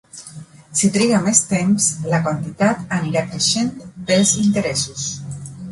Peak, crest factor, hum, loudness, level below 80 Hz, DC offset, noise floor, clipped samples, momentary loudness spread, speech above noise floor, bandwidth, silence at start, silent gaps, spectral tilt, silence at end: 0 dBFS; 18 dB; none; -18 LUFS; -52 dBFS; under 0.1%; -39 dBFS; under 0.1%; 16 LU; 21 dB; 11.5 kHz; 0.15 s; none; -4 dB/octave; 0 s